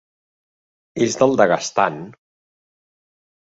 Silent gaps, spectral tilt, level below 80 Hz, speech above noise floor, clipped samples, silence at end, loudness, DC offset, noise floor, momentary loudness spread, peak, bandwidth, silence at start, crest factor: none; -4.5 dB/octave; -60 dBFS; over 72 dB; under 0.1%; 1.3 s; -18 LUFS; under 0.1%; under -90 dBFS; 15 LU; 0 dBFS; 8 kHz; 0.95 s; 22 dB